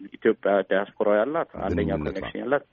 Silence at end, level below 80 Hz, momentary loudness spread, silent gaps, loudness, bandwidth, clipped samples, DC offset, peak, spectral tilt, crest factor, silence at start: 0.1 s; -46 dBFS; 6 LU; none; -25 LUFS; 6.8 kHz; under 0.1%; under 0.1%; -8 dBFS; -5 dB/octave; 16 dB; 0 s